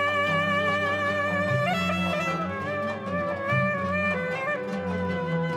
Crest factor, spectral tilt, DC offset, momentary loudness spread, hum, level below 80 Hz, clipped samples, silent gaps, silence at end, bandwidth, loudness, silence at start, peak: 14 dB; -6 dB/octave; under 0.1%; 6 LU; none; -60 dBFS; under 0.1%; none; 0 s; 13.5 kHz; -26 LUFS; 0 s; -12 dBFS